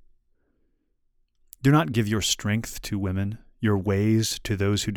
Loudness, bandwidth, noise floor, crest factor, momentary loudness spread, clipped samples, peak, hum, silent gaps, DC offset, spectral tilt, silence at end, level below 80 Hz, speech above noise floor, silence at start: -25 LUFS; 19.5 kHz; -69 dBFS; 20 dB; 8 LU; under 0.1%; -6 dBFS; none; none; under 0.1%; -5 dB/octave; 0 s; -48 dBFS; 45 dB; 1.65 s